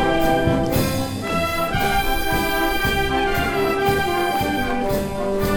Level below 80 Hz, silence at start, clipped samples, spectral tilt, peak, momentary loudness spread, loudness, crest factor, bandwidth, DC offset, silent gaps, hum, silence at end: -30 dBFS; 0 s; under 0.1%; -5 dB/octave; -6 dBFS; 4 LU; -20 LUFS; 14 dB; over 20 kHz; under 0.1%; none; none; 0 s